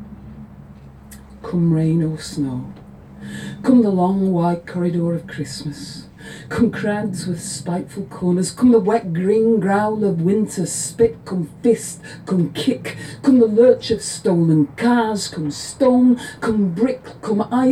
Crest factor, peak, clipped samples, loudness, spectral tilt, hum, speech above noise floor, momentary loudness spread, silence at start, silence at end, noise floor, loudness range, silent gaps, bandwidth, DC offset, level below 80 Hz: 16 dB; -2 dBFS; under 0.1%; -18 LUFS; -6.5 dB/octave; none; 22 dB; 16 LU; 0 s; 0 s; -40 dBFS; 6 LU; none; 14 kHz; under 0.1%; -50 dBFS